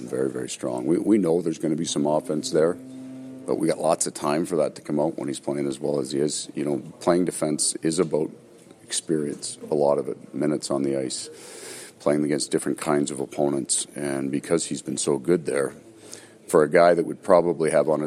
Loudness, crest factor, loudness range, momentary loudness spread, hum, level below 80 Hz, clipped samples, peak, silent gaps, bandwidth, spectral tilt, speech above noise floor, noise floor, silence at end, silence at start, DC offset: -24 LUFS; 20 dB; 3 LU; 11 LU; none; -66 dBFS; under 0.1%; -4 dBFS; none; 15 kHz; -4.5 dB/octave; 21 dB; -45 dBFS; 0 s; 0 s; under 0.1%